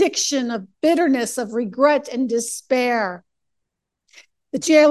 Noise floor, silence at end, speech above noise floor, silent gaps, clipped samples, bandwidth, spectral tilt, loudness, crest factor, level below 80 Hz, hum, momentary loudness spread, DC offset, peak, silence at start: -79 dBFS; 0 s; 60 dB; none; under 0.1%; 12.5 kHz; -3 dB/octave; -20 LUFS; 18 dB; -70 dBFS; none; 9 LU; under 0.1%; -2 dBFS; 0 s